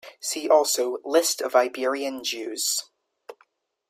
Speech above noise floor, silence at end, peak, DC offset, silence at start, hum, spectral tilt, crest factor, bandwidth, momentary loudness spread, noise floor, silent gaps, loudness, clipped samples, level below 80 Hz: 41 dB; 0.6 s; -4 dBFS; under 0.1%; 0.05 s; none; 0.5 dB/octave; 20 dB; 16 kHz; 9 LU; -65 dBFS; none; -24 LUFS; under 0.1%; -82 dBFS